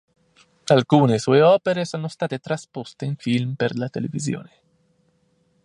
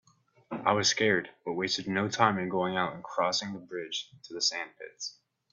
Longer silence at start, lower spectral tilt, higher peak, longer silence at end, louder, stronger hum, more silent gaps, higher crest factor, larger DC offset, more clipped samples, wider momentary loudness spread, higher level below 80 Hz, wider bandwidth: first, 0.65 s vs 0.5 s; first, -6.5 dB/octave vs -3 dB/octave; first, -2 dBFS vs -6 dBFS; first, 1.2 s vs 0.4 s; first, -21 LUFS vs -30 LUFS; neither; neither; about the same, 20 dB vs 24 dB; neither; neither; about the same, 14 LU vs 14 LU; first, -64 dBFS vs -72 dBFS; first, 11 kHz vs 8 kHz